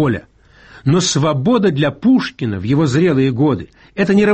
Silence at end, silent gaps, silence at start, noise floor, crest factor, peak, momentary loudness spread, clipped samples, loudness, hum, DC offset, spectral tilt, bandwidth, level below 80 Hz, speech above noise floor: 0 s; none; 0 s; -43 dBFS; 12 dB; -2 dBFS; 9 LU; under 0.1%; -15 LUFS; none; 0.1%; -6 dB/octave; 8.6 kHz; -46 dBFS; 29 dB